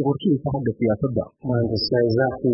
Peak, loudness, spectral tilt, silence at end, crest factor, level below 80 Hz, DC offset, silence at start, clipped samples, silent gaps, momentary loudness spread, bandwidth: -8 dBFS; -22 LUFS; -11.5 dB/octave; 0 s; 12 dB; -48 dBFS; under 0.1%; 0 s; under 0.1%; none; 6 LU; 5.8 kHz